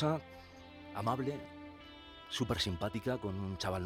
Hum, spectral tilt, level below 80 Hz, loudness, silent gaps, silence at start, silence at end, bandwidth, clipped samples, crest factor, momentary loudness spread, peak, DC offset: none; -5.5 dB/octave; -58 dBFS; -38 LUFS; none; 0 s; 0 s; 16.5 kHz; under 0.1%; 20 dB; 18 LU; -18 dBFS; under 0.1%